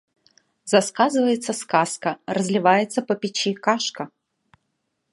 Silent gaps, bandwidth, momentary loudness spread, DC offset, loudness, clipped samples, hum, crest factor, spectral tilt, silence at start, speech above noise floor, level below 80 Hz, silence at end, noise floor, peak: none; 11.5 kHz; 9 LU; under 0.1%; -21 LUFS; under 0.1%; none; 20 dB; -4 dB/octave; 0.65 s; 54 dB; -74 dBFS; 1.05 s; -75 dBFS; -2 dBFS